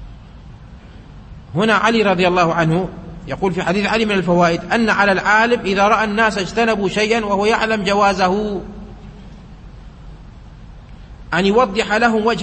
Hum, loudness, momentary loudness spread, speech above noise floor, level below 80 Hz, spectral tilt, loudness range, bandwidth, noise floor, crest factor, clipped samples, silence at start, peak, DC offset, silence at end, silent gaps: none; -16 LUFS; 9 LU; 22 dB; -40 dBFS; -5 dB/octave; 7 LU; 8.8 kHz; -38 dBFS; 16 dB; under 0.1%; 0 s; -2 dBFS; under 0.1%; 0 s; none